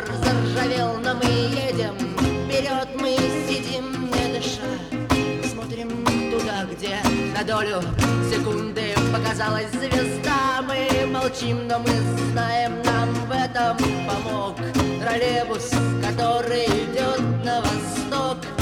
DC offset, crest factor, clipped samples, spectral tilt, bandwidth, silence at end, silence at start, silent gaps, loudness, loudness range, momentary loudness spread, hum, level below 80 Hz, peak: under 0.1%; 18 dB; under 0.1%; -5 dB/octave; 18 kHz; 0 s; 0 s; none; -23 LUFS; 2 LU; 4 LU; none; -42 dBFS; -6 dBFS